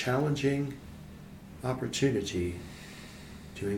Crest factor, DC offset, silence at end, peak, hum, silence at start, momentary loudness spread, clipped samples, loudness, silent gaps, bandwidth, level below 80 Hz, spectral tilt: 16 dB; under 0.1%; 0 s; -16 dBFS; none; 0 s; 19 LU; under 0.1%; -32 LUFS; none; 16.5 kHz; -54 dBFS; -5.5 dB/octave